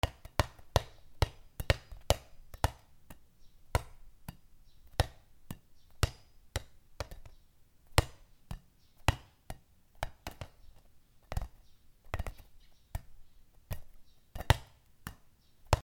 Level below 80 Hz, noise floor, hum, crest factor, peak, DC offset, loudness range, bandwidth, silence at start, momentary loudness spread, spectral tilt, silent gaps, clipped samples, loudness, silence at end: -44 dBFS; -61 dBFS; none; 36 dB; -2 dBFS; under 0.1%; 10 LU; 19.5 kHz; 0.05 s; 20 LU; -4.5 dB/octave; none; under 0.1%; -37 LUFS; 0 s